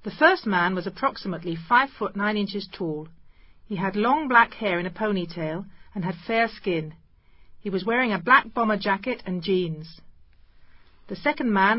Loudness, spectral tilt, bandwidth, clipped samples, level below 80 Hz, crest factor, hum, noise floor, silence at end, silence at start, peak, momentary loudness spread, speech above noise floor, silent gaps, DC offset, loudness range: -24 LUFS; -10 dB/octave; 5.8 kHz; under 0.1%; -56 dBFS; 22 dB; none; -52 dBFS; 0 s; 0 s; -2 dBFS; 13 LU; 28 dB; none; under 0.1%; 4 LU